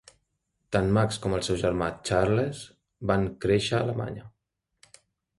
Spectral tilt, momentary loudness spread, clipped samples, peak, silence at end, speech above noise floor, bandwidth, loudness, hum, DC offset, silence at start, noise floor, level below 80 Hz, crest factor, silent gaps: -6 dB/octave; 12 LU; under 0.1%; -8 dBFS; 1.1 s; 55 dB; 11.5 kHz; -27 LUFS; none; under 0.1%; 0.7 s; -81 dBFS; -48 dBFS; 20 dB; none